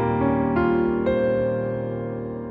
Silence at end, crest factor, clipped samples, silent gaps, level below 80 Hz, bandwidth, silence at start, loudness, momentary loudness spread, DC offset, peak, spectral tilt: 0 s; 14 dB; under 0.1%; none; -42 dBFS; 5 kHz; 0 s; -23 LUFS; 8 LU; under 0.1%; -8 dBFS; -11 dB/octave